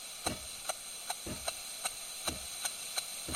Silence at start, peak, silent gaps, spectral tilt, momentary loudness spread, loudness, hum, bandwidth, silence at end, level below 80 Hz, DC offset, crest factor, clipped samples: 0 s; -16 dBFS; none; -1 dB/octave; 2 LU; -38 LUFS; none; 16 kHz; 0 s; -58 dBFS; under 0.1%; 24 dB; under 0.1%